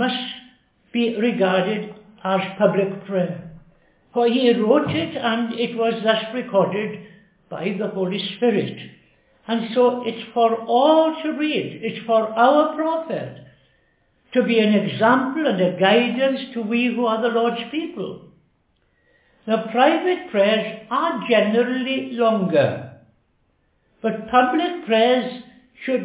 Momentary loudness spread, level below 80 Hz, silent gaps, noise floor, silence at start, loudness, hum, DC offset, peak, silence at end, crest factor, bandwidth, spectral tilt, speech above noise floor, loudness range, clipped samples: 12 LU; -64 dBFS; none; -65 dBFS; 0 s; -20 LUFS; none; under 0.1%; -2 dBFS; 0 s; 18 dB; 4 kHz; -9.5 dB/octave; 45 dB; 4 LU; under 0.1%